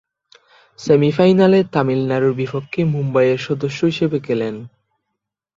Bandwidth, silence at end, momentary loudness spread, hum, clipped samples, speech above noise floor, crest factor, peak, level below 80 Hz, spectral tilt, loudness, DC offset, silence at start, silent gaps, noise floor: 7.6 kHz; 0.9 s; 10 LU; none; under 0.1%; 62 dB; 16 dB; -2 dBFS; -58 dBFS; -7.5 dB/octave; -17 LUFS; under 0.1%; 0.8 s; none; -79 dBFS